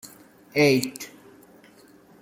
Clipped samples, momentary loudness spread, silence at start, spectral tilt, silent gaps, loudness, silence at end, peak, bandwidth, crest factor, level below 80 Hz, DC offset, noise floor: under 0.1%; 21 LU; 0.05 s; -4.5 dB/octave; none; -22 LUFS; 1.15 s; -8 dBFS; 16.5 kHz; 20 dB; -68 dBFS; under 0.1%; -53 dBFS